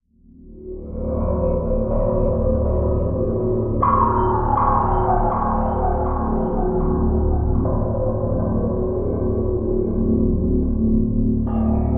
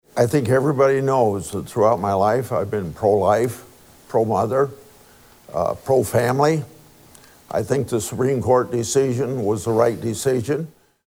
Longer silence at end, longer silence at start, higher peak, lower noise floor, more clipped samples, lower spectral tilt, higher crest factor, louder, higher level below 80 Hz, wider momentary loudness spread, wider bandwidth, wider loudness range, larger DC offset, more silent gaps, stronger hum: second, 0 s vs 0.35 s; second, 0 s vs 0.15 s; about the same, -4 dBFS vs -4 dBFS; about the same, -46 dBFS vs -49 dBFS; neither; first, -8 dB/octave vs -6 dB/octave; about the same, 14 dB vs 16 dB; about the same, -20 LUFS vs -20 LUFS; first, -24 dBFS vs -56 dBFS; second, 4 LU vs 8 LU; second, 2.9 kHz vs over 20 kHz; about the same, 2 LU vs 3 LU; first, 1% vs under 0.1%; neither; neither